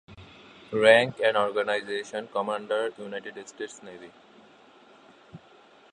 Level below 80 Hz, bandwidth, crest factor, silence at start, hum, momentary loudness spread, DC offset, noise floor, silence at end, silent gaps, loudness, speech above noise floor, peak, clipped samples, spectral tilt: -68 dBFS; 10.5 kHz; 26 dB; 0.1 s; none; 21 LU; under 0.1%; -55 dBFS; 0.55 s; none; -25 LUFS; 29 dB; -2 dBFS; under 0.1%; -4 dB/octave